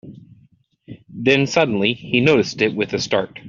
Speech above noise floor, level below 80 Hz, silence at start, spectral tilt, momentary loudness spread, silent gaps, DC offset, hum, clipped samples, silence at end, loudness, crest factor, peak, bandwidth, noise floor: 38 dB; -56 dBFS; 0.05 s; -5 dB/octave; 7 LU; none; under 0.1%; none; under 0.1%; 0 s; -18 LUFS; 18 dB; -2 dBFS; 7.6 kHz; -56 dBFS